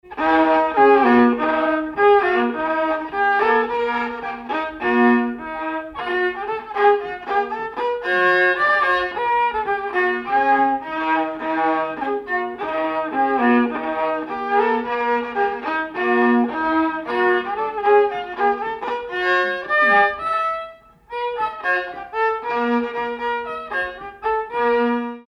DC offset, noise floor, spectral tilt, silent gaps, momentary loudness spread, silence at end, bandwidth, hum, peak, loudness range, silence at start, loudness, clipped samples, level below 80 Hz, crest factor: under 0.1%; -40 dBFS; -5.5 dB/octave; none; 10 LU; 0.05 s; 7 kHz; none; -4 dBFS; 4 LU; 0.05 s; -19 LUFS; under 0.1%; -54 dBFS; 14 dB